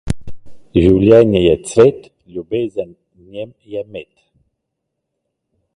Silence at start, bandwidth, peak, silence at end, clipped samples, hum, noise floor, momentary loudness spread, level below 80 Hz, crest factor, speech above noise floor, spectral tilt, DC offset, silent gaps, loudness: 0.05 s; 11.5 kHz; 0 dBFS; 1.7 s; under 0.1%; none; -76 dBFS; 22 LU; -36 dBFS; 16 dB; 62 dB; -7 dB/octave; under 0.1%; none; -13 LUFS